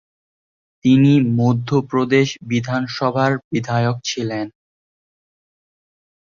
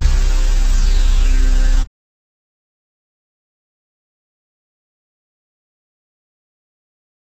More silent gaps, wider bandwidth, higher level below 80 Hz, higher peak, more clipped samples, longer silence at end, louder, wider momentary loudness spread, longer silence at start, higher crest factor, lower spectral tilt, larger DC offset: first, 3.44-3.51 s vs none; second, 7.4 kHz vs 8.4 kHz; second, -56 dBFS vs -18 dBFS; about the same, -2 dBFS vs -2 dBFS; neither; second, 1.7 s vs 5.5 s; about the same, -18 LUFS vs -19 LUFS; first, 9 LU vs 3 LU; first, 0.85 s vs 0 s; about the same, 16 dB vs 14 dB; first, -6.5 dB/octave vs -4.5 dB/octave; neither